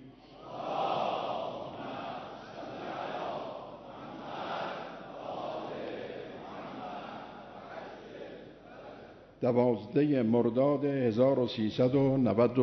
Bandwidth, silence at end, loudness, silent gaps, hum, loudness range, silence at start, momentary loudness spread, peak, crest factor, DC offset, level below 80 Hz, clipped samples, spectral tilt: 6.4 kHz; 0 s; -32 LUFS; none; none; 14 LU; 0 s; 20 LU; -14 dBFS; 20 dB; under 0.1%; -66 dBFS; under 0.1%; -8.5 dB/octave